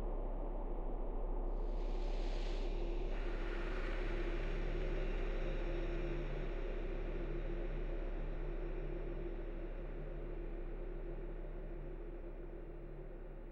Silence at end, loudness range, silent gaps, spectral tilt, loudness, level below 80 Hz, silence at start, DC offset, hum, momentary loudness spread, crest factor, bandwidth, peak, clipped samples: 0 s; 6 LU; none; -7.5 dB/octave; -45 LUFS; -40 dBFS; 0 s; under 0.1%; none; 7 LU; 12 dB; 5.8 kHz; -28 dBFS; under 0.1%